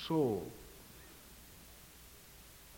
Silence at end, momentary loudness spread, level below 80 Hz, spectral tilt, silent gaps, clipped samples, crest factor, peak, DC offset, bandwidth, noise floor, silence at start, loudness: 0 s; 21 LU; -62 dBFS; -6 dB/octave; none; under 0.1%; 20 dB; -22 dBFS; under 0.1%; 17 kHz; -57 dBFS; 0 s; -37 LUFS